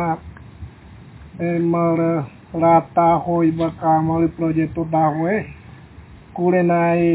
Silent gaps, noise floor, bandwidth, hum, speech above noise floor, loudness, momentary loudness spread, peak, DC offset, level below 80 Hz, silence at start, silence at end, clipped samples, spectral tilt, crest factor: none; -42 dBFS; 4 kHz; none; 24 dB; -19 LUFS; 15 LU; -4 dBFS; under 0.1%; -46 dBFS; 0 s; 0 s; under 0.1%; -12.5 dB/octave; 16 dB